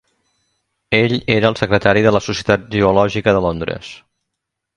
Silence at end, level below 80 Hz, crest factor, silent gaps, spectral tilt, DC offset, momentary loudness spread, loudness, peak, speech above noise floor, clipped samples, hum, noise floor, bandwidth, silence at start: 0.8 s; -42 dBFS; 16 dB; none; -6 dB/octave; under 0.1%; 10 LU; -15 LUFS; 0 dBFS; 63 dB; under 0.1%; none; -78 dBFS; 10.5 kHz; 0.9 s